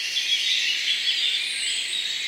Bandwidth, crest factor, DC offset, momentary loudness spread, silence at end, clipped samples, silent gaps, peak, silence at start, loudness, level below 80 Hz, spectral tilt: 16 kHz; 14 dB; under 0.1%; 4 LU; 0 s; under 0.1%; none; -10 dBFS; 0 s; -21 LUFS; -80 dBFS; 4 dB/octave